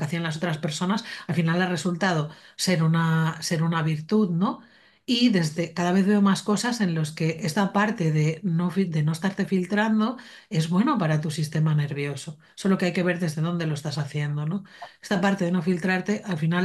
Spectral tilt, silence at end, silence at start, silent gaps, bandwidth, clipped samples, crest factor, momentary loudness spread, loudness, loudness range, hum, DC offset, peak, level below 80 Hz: -6 dB/octave; 0 s; 0 s; none; 12.5 kHz; under 0.1%; 16 dB; 7 LU; -25 LUFS; 3 LU; none; under 0.1%; -8 dBFS; -68 dBFS